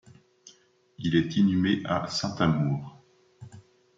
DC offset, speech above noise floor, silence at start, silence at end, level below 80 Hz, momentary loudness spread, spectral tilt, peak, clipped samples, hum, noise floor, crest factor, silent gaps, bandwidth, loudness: under 0.1%; 35 dB; 0.45 s; 0.35 s; -62 dBFS; 10 LU; -6 dB/octave; -10 dBFS; under 0.1%; none; -60 dBFS; 18 dB; none; 7.8 kHz; -26 LUFS